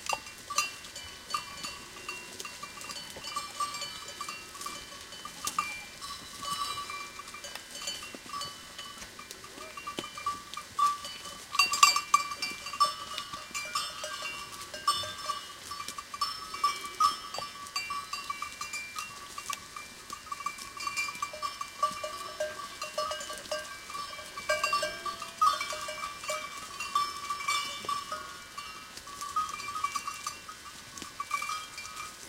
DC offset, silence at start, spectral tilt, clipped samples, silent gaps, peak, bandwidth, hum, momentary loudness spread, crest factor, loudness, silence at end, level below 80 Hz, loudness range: under 0.1%; 0 s; 0 dB/octave; under 0.1%; none; -4 dBFS; 17 kHz; none; 13 LU; 32 dB; -34 LUFS; 0 s; -64 dBFS; 10 LU